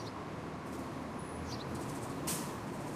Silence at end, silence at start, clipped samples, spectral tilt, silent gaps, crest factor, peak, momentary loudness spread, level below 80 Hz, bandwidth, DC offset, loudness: 0 s; 0 s; under 0.1%; -4.5 dB/octave; none; 18 dB; -24 dBFS; 6 LU; -60 dBFS; 15.5 kHz; under 0.1%; -41 LUFS